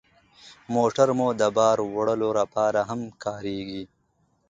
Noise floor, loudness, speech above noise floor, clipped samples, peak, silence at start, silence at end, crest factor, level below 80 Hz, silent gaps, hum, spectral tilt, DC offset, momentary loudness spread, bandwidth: -68 dBFS; -24 LUFS; 44 dB; under 0.1%; -6 dBFS; 0.45 s; 0.65 s; 20 dB; -62 dBFS; none; none; -5.5 dB/octave; under 0.1%; 12 LU; 9.2 kHz